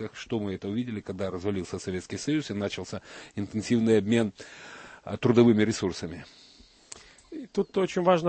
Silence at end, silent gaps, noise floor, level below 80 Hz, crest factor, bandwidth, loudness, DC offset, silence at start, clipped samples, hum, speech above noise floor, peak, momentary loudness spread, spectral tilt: 0 s; none; -51 dBFS; -60 dBFS; 20 dB; 8.8 kHz; -28 LUFS; under 0.1%; 0 s; under 0.1%; none; 23 dB; -6 dBFS; 21 LU; -6 dB/octave